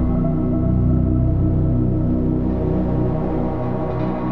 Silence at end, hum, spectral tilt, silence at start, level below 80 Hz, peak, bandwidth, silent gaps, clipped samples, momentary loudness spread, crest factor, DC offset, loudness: 0 s; none; -12 dB/octave; 0 s; -26 dBFS; -6 dBFS; 4.3 kHz; none; under 0.1%; 5 LU; 12 dB; 2%; -20 LUFS